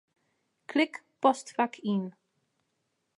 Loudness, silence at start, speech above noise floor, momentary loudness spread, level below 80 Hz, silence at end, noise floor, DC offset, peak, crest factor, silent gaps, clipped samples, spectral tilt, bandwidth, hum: -30 LUFS; 0.7 s; 51 dB; 6 LU; -86 dBFS; 1.1 s; -79 dBFS; under 0.1%; -8 dBFS; 24 dB; none; under 0.1%; -5 dB/octave; 11.5 kHz; none